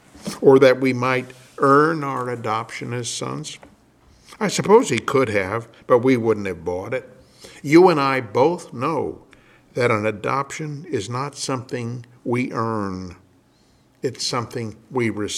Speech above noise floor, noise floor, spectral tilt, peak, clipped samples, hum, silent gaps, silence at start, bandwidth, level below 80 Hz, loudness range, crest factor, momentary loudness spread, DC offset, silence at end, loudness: 37 dB; -57 dBFS; -5.5 dB/octave; -2 dBFS; under 0.1%; none; none; 0.15 s; 14 kHz; -60 dBFS; 8 LU; 20 dB; 15 LU; under 0.1%; 0 s; -20 LUFS